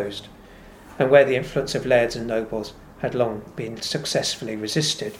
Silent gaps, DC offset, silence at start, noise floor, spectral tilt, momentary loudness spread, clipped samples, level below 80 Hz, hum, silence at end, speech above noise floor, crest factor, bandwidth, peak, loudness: none; under 0.1%; 0 s; -45 dBFS; -4 dB/octave; 15 LU; under 0.1%; -50 dBFS; none; 0 s; 23 dB; 20 dB; 16 kHz; -2 dBFS; -23 LUFS